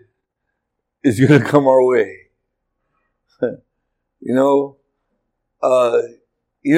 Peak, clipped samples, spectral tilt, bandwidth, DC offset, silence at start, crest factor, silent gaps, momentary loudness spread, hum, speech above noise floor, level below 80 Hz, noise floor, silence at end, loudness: 0 dBFS; under 0.1%; -7.5 dB/octave; 14 kHz; under 0.1%; 1.05 s; 18 dB; none; 14 LU; none; 62 dB; -66 dBFS; -76 dBFS; 0 s; -16 LUFS